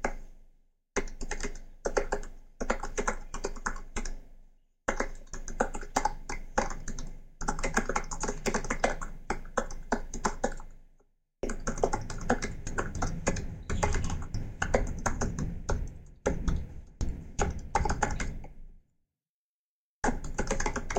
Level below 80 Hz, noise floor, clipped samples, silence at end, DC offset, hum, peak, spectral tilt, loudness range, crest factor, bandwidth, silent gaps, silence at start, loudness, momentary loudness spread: -36 dBFS; under -90 dBFS; under 0.1%; 0 s; under 0.1%; none; -8 dBFS; -4.5 dB/octave; 3 LU; 24 dB; 9.4 kHz; 19.29-20.02 s; 0 s; -34 LUFS; 10 LU